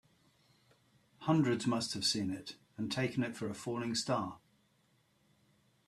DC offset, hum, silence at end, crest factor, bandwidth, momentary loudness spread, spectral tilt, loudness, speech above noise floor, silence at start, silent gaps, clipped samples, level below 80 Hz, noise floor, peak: under 0.1%; none; 1.5 s; 20 dB; 13.5 kHz; 11 LU; -4.5 dB/octave; -35 LUFS; 38 dB; 1.2 s; none; under 0.1%; -74 dBFS; -73 dBFS; -18 dBFS